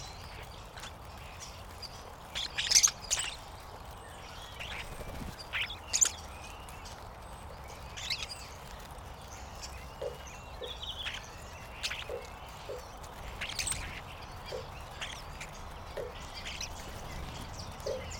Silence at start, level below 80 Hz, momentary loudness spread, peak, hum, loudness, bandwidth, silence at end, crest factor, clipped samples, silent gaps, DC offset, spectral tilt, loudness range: 0 s; -50 dBFS; 15 LU; -8 dBFS; none; -36 LUFS; over 20 kHz; 0 s; 30 dB; under 0.1%; none; under 0.1%; -1 dB/octave; 11 LU